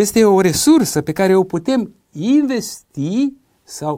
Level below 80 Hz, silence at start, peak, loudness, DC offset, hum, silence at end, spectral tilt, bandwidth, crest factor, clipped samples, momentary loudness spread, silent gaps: -48 dBFS; 0 s; -2 dBFS; -16 LUFS; under 0.1%; none; 0 s; -5 dB/octave; 16 kHz; 14 dB; under 0.1%; 14 LU; none